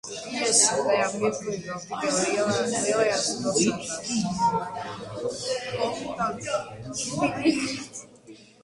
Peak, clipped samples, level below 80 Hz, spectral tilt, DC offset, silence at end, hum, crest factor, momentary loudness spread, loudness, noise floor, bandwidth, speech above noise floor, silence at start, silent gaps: -4 dBFS; under 0.1%; -60 dBFS; -3 dB/octave; under 0.1%; 0.2 s; none; 22 dB; 12 LU; -26 LUFS; -49 dBFS; 11.5 kHz; 23 dB; 0.05 s; none